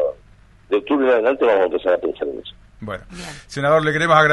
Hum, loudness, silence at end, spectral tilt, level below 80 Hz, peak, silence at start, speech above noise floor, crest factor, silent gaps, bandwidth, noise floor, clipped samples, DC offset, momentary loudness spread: none; -18 LUFS; 0 s; -5.5 dB/octave; -48 dBFS; -2 dBFS; 0 s; 31 dB; 18 dB; none; 11.5 kHz; -48 dBFS; under 0.1%; under 0.1%; 18 LU